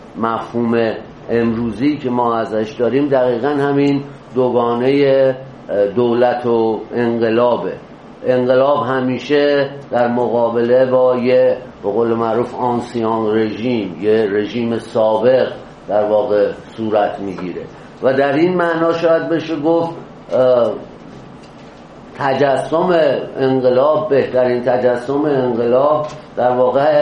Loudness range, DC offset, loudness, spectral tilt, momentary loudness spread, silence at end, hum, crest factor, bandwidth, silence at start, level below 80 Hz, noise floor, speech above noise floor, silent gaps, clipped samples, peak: 3 LU; under 0.1%; -16 LUFS; -7.5 dB/octave; 8 LU; 0 s; none; 14 dB; 10 kHz; 0 s; -52 dBFS; -37 dBFS; 22 dB; none; under 0.1%; 0 dBFS